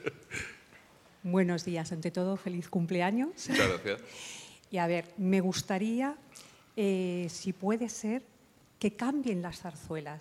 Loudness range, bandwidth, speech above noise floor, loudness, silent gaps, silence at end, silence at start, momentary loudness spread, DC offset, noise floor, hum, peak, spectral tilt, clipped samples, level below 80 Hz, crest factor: 3 LU; 15 kHz; 27 dB; -33 LUFS; none; 0 s; 0 s; 14 LU; under 0.1%; -59 dBFS; none; -10 dBFS; -5.5 dB/octave; under 0.1%; -64 dBFS; 22 dB